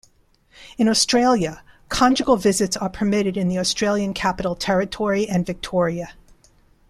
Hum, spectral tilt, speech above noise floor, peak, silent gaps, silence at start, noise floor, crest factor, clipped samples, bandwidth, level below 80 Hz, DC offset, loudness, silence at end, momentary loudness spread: none; -4 dB/octave; 38 dB; -2 dBFS; none; 0.6 s; -58 dBFS; 18 dB; under 0.1%; 14.5 kHz; -46 dBFS; under 0.1%; -20 LUFS; 0.8 s; 8 LU